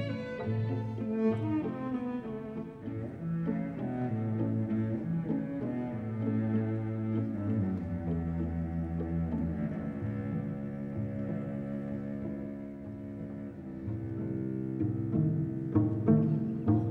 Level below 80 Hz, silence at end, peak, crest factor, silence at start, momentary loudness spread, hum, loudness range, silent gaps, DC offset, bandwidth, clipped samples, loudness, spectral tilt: -52 dBFS; 0 s; -12 dBFS; 20 dB; 0 s; 10 LU; none; 6 LU; none; under 0.1%; 4.7 kHz; under 0.1%; -34 LUFS; -11 dB/octave